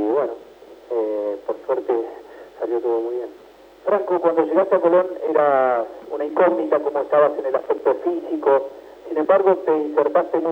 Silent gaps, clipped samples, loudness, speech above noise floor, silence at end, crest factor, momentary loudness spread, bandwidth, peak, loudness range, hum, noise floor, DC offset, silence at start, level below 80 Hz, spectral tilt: none; under 0.1%; -20 LUFS; 24 dB; 0 s; 18 dB; 12 LU; 5.8 kHz; -2 dBFS; 6 LU; none; -43 dBFS; under 0.1%; 0 s; -66 dBFS; -7.5 dB/octave